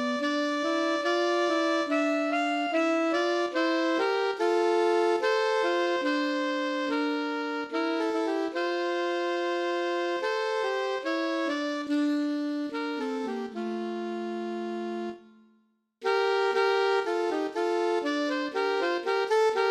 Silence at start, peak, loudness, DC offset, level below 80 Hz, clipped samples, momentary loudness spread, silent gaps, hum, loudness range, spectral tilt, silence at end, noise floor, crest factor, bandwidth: 0 s; -14 dBFS; -28 LUFS; under 0.1%; -80 dBFS; under 0.1%; 8 LU; none; none; 5 LU; -3 dB/octave; 0 s; -68 dBFS; 14 dB; 11.5 kHz